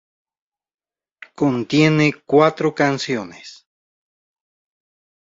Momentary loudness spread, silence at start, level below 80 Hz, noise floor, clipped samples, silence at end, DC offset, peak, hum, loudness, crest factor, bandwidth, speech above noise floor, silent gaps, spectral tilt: 11 LU; 1.4 s; -62 dBFS; -46 dBFS; under 0.1%; 1.8 s; under 0.1%; -2 dBFS; none; -18 LUFS; 20 dB; 7.8 kHz; 29 dB; none; -6 dB/octave